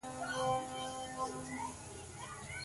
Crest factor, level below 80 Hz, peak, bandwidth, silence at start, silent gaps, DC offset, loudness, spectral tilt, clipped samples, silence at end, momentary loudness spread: 18 dB; -62 dBFS; -22 dBFS; 12 kHz; 0.05 s; none; under 0.1%; -41 LUFS; -3.5 dB/octave; under 0.1%; 0 s; 11 LU